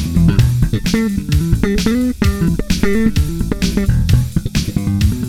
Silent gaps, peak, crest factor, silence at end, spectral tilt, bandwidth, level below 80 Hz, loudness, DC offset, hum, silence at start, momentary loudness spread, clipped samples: none; -2 dBFS; 14 dB; 0 s; -6.5 dB/octave; 17 kHz; -20 dBFS; -16 LUFS; under 0.1%; none; 0 s; 4 LU; under 0.1%